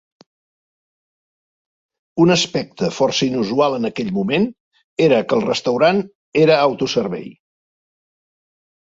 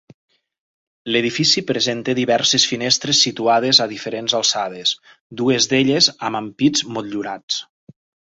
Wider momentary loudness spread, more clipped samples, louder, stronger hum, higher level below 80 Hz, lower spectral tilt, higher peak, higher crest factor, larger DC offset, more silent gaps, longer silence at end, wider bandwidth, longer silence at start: about the same, 9 LU vs 11 LU; neither; about the same, -17 LUFS vs -17 LUFS; neither; about the same, -58 dBFS vs -60 dBFS; first, -5 dB/octave vs -2.5 dB/octave; about the same, -2 dBFS vs 0 dBFS; about the same, 18 dB vs 20 dB; neither; first, 4.60-4.71 s, 4.84-4.97 s, 6.15-6.32 s vs 5.20-5.30 s, 7.43-7.48 s; first, 1.5 s vs 0.7 s; about the same, 8 kHz vs 8 kHz; first, 2.15 s vs 1.05 s